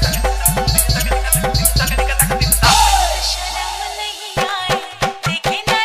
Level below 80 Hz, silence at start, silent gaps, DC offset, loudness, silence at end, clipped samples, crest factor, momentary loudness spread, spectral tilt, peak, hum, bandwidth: -22 dBFS; 0 s; none; under 0.1%; -15 LUFS; 0 s; under 0.1%; 16 dB; 10 LU; -2.5 dB/octave; 0 dBFS; none; 16 kHz